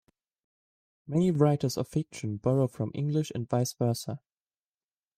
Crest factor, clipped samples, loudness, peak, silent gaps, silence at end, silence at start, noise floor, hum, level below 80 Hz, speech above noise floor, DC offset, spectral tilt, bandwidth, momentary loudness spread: 20 dB; under 0.1%; -29 LUFS; -10 dBFS; none; 1 s; 1.05 s; under -90 dBFS; none; -64 dBFS; over 62 dB; under 0.1%; -7 dB/octave; 15.5 kHz; 9 LU